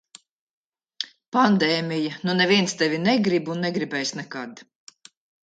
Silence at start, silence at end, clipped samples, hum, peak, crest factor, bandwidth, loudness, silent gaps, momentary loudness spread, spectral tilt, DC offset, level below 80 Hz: 1 s; 0.8 s; under 0.1%; none; -4 dBFS; 20 dB; 9.2 kHz; -22 LUFS; 1.28-1.32 s; 15 LU; -4.5 dB/octave; under 0.1%; -70 dBFS